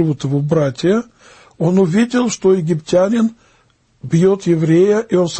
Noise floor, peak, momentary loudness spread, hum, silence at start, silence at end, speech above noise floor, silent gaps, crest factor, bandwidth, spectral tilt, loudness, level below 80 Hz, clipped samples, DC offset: -56 dBFS; -2 dBFS; 6 LU; none; 0 s; 0 s; 41 dB; none; 12 dB; 8.8 kHz; -7 dB/octave; -15 LUFS; -52 dBFS; under 0.1%; under 0.1%